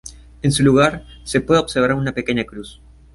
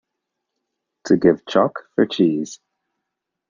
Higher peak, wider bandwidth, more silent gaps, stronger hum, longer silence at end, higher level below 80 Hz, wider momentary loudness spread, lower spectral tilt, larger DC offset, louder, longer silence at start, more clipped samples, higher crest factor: about the same, -2 dBFS vs -2 dBFS; first, 11.5 kHz vs 7.4 kHz; neither; neither; second, 0.4 s vs 0.95 s; first, -40 dBFS vs -60 dBFS; first, 20 LU vs 12 LU; about the same, -5.5 dB/octave vs -6 dB/octave; neither; about the same, -18 LUFS vs -19 LUFS; second, 0.05 s vs 1.05 s; neither; about the same, 16 dB vs 20 dB